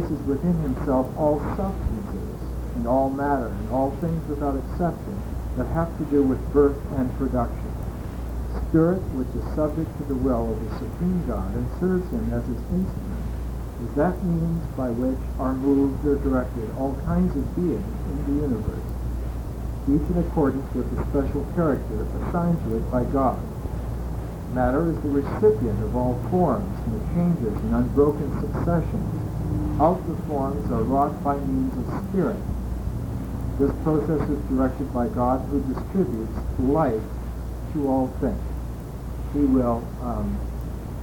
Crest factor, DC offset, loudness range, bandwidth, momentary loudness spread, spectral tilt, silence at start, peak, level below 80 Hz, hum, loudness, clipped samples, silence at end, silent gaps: 18 dB; under 0.1%; 3 LU; 18.5 kHz; 10 LU; -9 dB/octave; 0 s; -6 dBFS; -32 dBFS; none; -25 LUFS; under 0.1%; 0 s; none